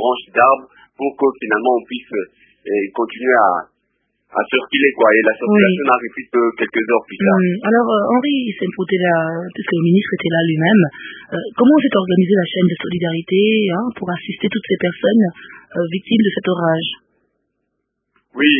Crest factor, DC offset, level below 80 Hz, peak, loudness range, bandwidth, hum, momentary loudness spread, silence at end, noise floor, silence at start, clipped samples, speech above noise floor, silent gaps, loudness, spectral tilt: 16 dB; under 0.1%; -62 dBFS; 0 dBFS; 4 LU; 3.7 kHz; none; 11 LU; 0 s; -73 dBFS; 0 s; under 0.1%; 57 dB; none; -16 LUFS; -10.5 dB/octave